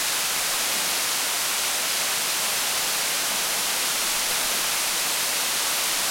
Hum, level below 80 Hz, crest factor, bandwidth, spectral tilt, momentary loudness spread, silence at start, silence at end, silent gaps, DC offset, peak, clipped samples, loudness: none; -60 dBFS; 14 dB; 16.5 kHz; 1.5 dB/octave; 1 LU; 0 s; 0 s; none; under 0.1%; -10 dBFS; under 0.1%; -22 LUFS